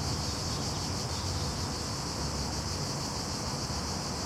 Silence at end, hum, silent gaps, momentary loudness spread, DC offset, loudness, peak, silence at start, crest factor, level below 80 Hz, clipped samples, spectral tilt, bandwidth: 0 s; none; none; 1 LU; under 0.1%; -33 LUFS; -20 dBFS; 0 s; 14 dB; -44 dBFS; under 0.1%; -3.5 dB/octave; 16.5 kHz